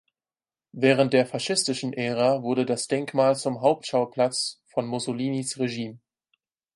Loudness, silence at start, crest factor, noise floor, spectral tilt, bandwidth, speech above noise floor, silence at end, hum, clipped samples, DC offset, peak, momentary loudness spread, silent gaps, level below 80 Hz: -25 LUFS; 0.75 s; 20 dB; under -90 dBFS; -4.5 dB/octave; 11.5 kHz; over 66 dB; 0.8 s; none; under 0.1%; under 0.1%; -6 dBFS; 8 LU; none; -72 dBFS